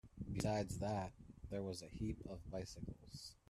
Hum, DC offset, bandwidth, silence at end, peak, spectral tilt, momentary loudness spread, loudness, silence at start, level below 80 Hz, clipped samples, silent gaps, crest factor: none; under 0.1%; 13.5 kHz; 0.15 s; -24 dBFS; -6 dB/octave; 12 LU; -46 LUFS; 0.05 s; -58 dBFS; under 0.1%; none; 22 dB